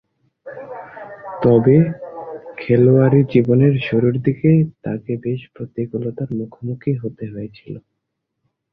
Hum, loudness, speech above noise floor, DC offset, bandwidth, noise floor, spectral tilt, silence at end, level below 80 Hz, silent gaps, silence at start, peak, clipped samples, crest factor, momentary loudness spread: none; -17 LUFS; 59 dB; under 0.1%; 5 kHz; -76 dBFS; -12 dB/octave; 0.95 s; -52 dBFS; none; 0.45 s; -2 dBFS; under 0.1%; 16 dB; 21 LU